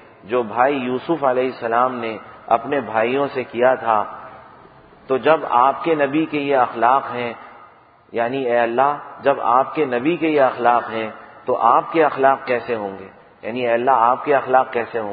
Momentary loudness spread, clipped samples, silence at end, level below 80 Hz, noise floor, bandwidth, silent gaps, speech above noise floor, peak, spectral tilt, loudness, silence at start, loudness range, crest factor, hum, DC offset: 11 LU; under 0.1%; 0 s; -62 dBFS; -48 dBFS; 5 kHz; none; 30 dB; 0 dBFS; -10.5 dB/octave; -19 LUFS; 0.25 s; 2 LU; 18 dB; none; under 0.1%